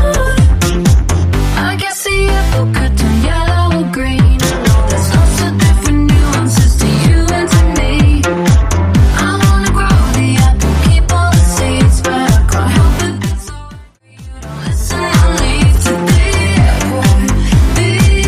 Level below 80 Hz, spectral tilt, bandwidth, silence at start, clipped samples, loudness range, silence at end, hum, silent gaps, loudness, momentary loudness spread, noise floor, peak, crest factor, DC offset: -14 dBFS; -5.5 dB/octave; 15.5 kHz; 0 s; under 0.1%; 3 LU; 0 s; none; none; -11 LUFS; 4 LU; -34 dBFS; 0 dBFS; 10 dB; under 0.1%